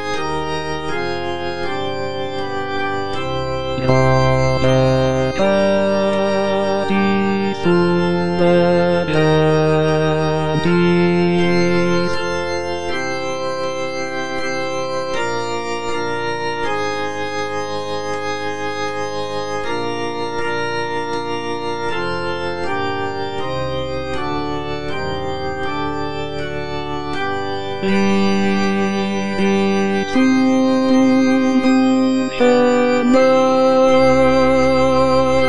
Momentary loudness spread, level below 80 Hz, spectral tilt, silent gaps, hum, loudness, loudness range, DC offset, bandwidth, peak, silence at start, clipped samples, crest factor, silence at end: 10 LU; -42 dBFS; -6 dB/octave; none; none; -18 LUFS; 9 LU; 4%; 10 kHz; -2 dBFS; 0 s; under 0.1%; 16 dB; 0 s